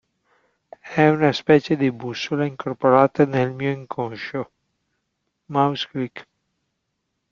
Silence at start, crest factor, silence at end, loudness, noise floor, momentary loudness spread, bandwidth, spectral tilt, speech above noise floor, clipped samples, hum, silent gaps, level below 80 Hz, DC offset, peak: 0.85 s; 20 dB; 1.1 s; -21 LUFS; -76 dBFS; 13 LU; 7.2 kHz; -7 dB/octave; 56 dB; under 0.1%; none; none; -62 dBFS; under 0.1%; -2 dBFS